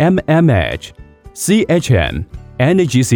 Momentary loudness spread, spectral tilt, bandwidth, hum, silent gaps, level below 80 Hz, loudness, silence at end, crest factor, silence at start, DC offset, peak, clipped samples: 15 LU; -6 dB/octave; 20 kHz; none; none; -32 dBFS; -14 LUFS; 0 s; 12 dB; 0 s; under 0.1%; 0 dBFS; under 0.1%